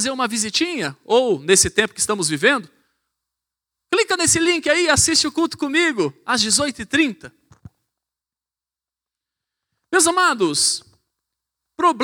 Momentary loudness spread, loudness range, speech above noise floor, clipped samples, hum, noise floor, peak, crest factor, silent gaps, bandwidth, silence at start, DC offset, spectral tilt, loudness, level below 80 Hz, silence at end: 7 LU; 6 LU; over 71 dB; under 0.1%; none; under -90 dBFS; 0 dBFS; 20 dB; none; 20 kHz; 0 s; under 0.1%; -2 dB/octave; -18 LUFS; -52 dBFS; 0 s